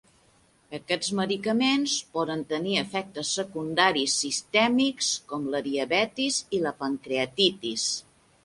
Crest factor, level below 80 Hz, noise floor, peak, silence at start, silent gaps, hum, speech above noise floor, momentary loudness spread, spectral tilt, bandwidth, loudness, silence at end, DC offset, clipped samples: 20 dB; -68 dBFS; -62 dBFS; -8 dBFS; 0.7 s; none; none; 35 dB; 8 LU; -2.5 dB/octave; 11.5 kHz; -26 LUFS; 0.45 s; under 0.1%; under 0.1%